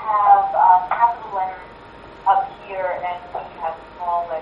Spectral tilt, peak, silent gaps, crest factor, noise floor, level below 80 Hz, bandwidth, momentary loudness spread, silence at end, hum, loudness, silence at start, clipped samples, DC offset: -6 dB/octave; -2 dBFS; none; 18 dB; -40 dBFS; -54 dBFS; 5.4 kHz; 15 LU; 0 s; none; -19 LUFS; 0 s; under 0.1%; under 0.1%